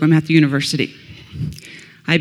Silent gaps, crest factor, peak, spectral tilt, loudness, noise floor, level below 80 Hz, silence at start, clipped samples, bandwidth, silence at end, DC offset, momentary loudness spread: none; 18 dB; 0 dBFS; -6 dB/octave; -18 LUFS; -40 dBFS; -48 dBFS; 0 s; under 0.1%; 13.5 kHz; 0 s; under 0.1%; 22 LU